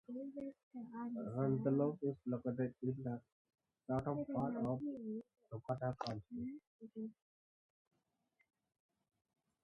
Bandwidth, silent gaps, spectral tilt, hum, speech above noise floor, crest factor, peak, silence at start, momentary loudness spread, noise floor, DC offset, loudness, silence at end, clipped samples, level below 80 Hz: 6.8 kHz; 0.63-0.71 s, 3.32-3.45 s, 6.67-6.79 s; -9.5 dB/octave; none; 41 dB; 20 dB; -24 dBFS; 0.1 s; 14 LU; -83 dBFS; under 0.1%; -43 LUFS; 2.5 s; under 0.1%; -72 dBFS